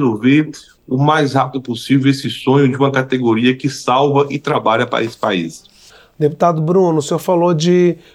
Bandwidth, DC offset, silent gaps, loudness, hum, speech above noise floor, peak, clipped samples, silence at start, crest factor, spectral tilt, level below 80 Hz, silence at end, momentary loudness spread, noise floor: 15.5 kHz; under 0.1%; none; -15 LUFS; none; 30 dB; -2 dBFS; under 0.1%; 0 s; 14 dB; -6.5 dB/octave; -58 dBFS; 0.15 s; 6 LU; -45 dBFS